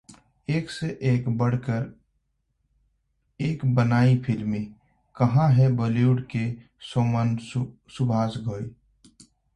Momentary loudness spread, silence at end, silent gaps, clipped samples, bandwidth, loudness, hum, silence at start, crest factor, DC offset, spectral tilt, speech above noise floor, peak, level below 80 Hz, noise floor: 13 LU; 0.8 s; none; under 0.1%; 9.4 kHz; -24 LUFS; none; 0.1 s; 16 dB; under 0.1%; -8 dB/octave; 50 dB; -8 dBFS; -54 dBFS; -73 dBFS